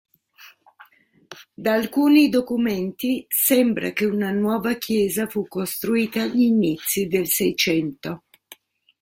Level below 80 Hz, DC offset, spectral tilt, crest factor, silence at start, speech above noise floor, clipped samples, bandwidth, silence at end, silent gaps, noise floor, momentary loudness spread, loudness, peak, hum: -60 dBFS; under 0.1%; -4 dB/octave; 16 dB; 0.4 s; 33 dB; under 0.1%; 16.5 kHz; 0.85 s; none; -53 dBFS; 10 LU; -21 LUFS; -4 dBFS; none